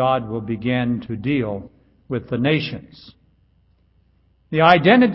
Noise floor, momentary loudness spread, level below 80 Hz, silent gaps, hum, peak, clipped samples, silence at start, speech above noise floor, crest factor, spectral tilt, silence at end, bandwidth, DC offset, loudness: -59 dBFS; 16 LU; -52 dBFS; none; none; 0 dBFS; under 0.1%; 0 s; 41 dB; 20 dB; -9 dB/octave; 0 s; 5.8 kHz; under 0.1%; -19 LUFS